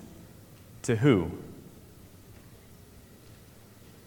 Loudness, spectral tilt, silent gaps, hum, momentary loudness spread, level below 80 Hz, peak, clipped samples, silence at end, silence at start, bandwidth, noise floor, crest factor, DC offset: -27 LUFS; -6.5 dB/octave; none; none; 28 LU; -58 dBFS; -10 dBFS; under 0.1%; 1.75 s; 0 s; 19 kHz; -53 dBFS; 22 dB; under 0.1%